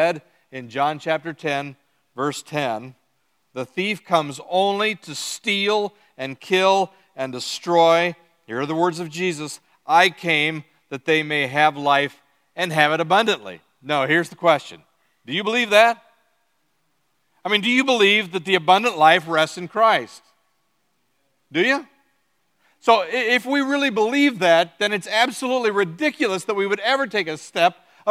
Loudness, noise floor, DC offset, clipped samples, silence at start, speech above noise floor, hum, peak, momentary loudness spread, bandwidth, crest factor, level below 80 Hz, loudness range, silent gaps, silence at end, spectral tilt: -20 LUFS; -70 dBFS; under 0.1%; under 0.1%; 0 s; 50 dB; none; 0 dBFS; 15 LU; 15 kHz; 22 dB; -76 dBFS; 6 LU; none; 0 s; -4 dB/octave